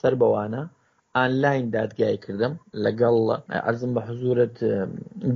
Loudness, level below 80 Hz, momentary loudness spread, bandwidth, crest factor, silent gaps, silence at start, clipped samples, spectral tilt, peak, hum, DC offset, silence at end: -24 LUFS; -64 dBFS; 8 LU; 6.8 kHz; 18 dB; none; 0.05 s; under 0.1%; -6 dB/octave; -6 dBFS; none; under 0.1%; 0 s